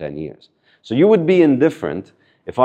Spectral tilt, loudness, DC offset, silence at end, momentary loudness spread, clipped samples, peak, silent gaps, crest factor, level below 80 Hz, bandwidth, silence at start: -8 dB/octave; -15 LUFS; under 0.1%; 0 s; 19 LU; under 0.1%; 0 dBFS; none; 16 dB; -58 dBFS; 9 kHz; 0 s